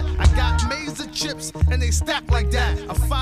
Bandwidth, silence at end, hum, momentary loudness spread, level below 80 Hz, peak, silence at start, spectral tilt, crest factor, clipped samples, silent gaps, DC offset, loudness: 14.5 kHz; 0 s; none; 7 LU; -22 dBFS; -4 dBFS; 0 s; -4.5 dB/octave; 16 dB; under 0.1%; none; under 0.1%; -22 LUFS